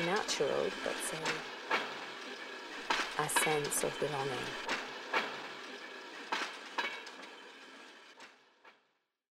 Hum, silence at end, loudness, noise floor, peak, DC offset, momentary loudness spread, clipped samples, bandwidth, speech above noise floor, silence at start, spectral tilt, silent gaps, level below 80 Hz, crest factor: none; 0.65 s; -36 LUFS; -78 dBFS; -16 dBFS; under 0.1%; 19 LU; under 0.1%; 16 kHz; 43 dB; 0 s; -2 dB/octave; none; -70 dBFS; 22 dB